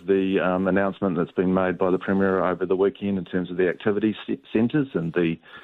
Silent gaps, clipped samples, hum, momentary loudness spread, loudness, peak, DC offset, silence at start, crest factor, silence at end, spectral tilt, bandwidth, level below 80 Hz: none; under 0.1%; none; 5 LU; -24 LUFS; -8 dBFS; under 0.1%; 0.05 s; 16 dB; 0.05 s; -10 dB/octave; 4.1 kHz; -60 dBFS